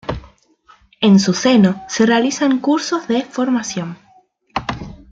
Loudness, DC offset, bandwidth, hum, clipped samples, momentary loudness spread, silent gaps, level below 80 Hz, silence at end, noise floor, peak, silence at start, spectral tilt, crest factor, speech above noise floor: -16 LUFS; under 0.1%; 7.8 kHz; none; under 0.1%; 15 LU; none; -46 dBFS; 0.15 s; -53 dBFS; -2 dBFS; 0.1 s; -5 dB/octave; 16 dB; 38 dB